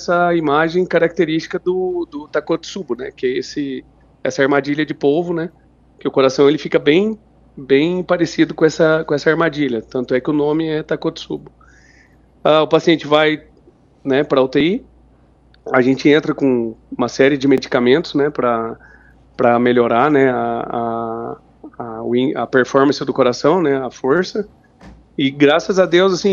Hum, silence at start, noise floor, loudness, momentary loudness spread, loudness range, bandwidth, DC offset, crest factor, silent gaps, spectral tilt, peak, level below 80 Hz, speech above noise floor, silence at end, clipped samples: none; 0 s; -50 dBFS; -16 LUFS; 13 LU; 4 LU; 7.4 kHz; under 0.1%; 16 dB; none; -6 dB/octave; 0 dBFS; -52 dBFS; 35 dB; 0 s; under 0.1%